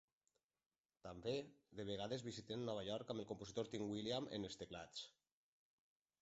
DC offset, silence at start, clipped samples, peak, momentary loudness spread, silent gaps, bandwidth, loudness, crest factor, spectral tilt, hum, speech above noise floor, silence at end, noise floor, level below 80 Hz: under 0.1%; 1.05 s; under 0.1%; -30 dBFS; 9 LU; none; 8 kHz; -48 LUFS; 20 dB; -4.5 dB/octave; none; over 42 dB; 1.1 s; under -90 dBFS; -76 dBFS